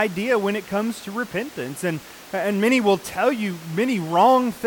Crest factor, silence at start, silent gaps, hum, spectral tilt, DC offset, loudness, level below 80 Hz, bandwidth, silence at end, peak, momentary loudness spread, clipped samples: 16 dB; 0 s; none; none; -5 dB/octave; under 0.1%; -22 LUFS; -62 dBFS; 19 kHz; 0 s; -6 dBFS; 11 LU; under 0.1%